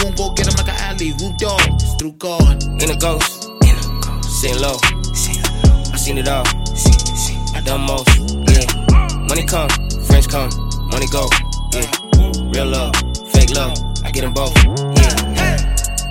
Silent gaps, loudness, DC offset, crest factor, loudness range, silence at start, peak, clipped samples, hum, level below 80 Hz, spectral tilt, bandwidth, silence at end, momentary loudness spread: none; -15 LUFS; under 0.1%; 14 dB; 2 LU; 0 s; 0 dBFS; under 0.1%; none; -16 dBFS; -4 dB/octave; 17 kHz; 0 s; 7 LU